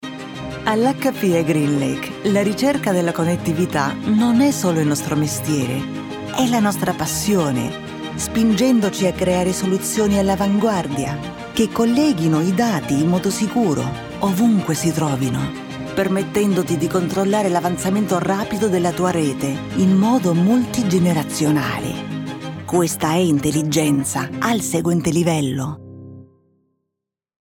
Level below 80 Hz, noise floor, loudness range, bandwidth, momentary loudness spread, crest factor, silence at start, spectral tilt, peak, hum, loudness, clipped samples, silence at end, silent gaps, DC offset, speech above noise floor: -48 dBFS; -82 dBFS; 2 LU; 19 kHz; 9 LU; 14 dB; 0 s; -5.5 dB/octave; -4 dBFS; none; -19 LUFS; under 0.1%; 1.35 s; none; under 0.1%; 65 dB